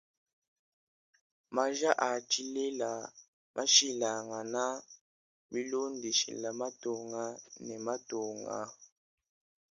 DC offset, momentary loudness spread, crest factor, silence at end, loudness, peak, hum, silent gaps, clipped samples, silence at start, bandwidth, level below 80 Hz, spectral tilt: under 0.1%; 15 LU; 26 dB; 0.85 s; -33 LUFS; -10 dBFS; none; 3.28-3.54 s, 5.01-5.49 s; under 0.1%; 1.5 s; 10.5 kHz; -84 dBFS; -1 dB/octave